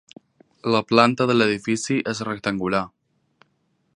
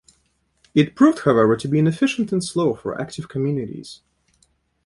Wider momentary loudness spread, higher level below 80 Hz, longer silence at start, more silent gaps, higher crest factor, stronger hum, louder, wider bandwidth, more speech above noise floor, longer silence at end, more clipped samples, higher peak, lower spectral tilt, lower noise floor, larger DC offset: second, 9 LU vs 13 LU; about the same, -60 dBFS vs -56 dBFS; about the same, 0.65 s vs 0.75 s; neither; about the same, 22 dB vs 18 dB; neither; about the same, -21 LUFS vs -20 LUFS; about the same, 11 kHz vs 11.5 kHz; about the same, 48 dB vs 47 dB; first, 1.1 s vs 0.9 s; neither; about the same, 0 dBFS vs -2 dBFS; second, -5 dB/octave vs -6.5 dB/octave; about the same, -68 dBFS vs -66 dBFS; neither